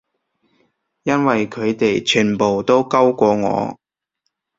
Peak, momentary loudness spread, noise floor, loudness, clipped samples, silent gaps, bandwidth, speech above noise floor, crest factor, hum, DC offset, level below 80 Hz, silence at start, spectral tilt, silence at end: -2 dBFS; 7 LU; -74 dBFS; -17 LUFS; under 0.1%; none; 7.8 kHz; 58 dB; 16 dB; none; under 0.1%; -56 dBFS; 1.05 s; -5 dB/octave; 0.85 s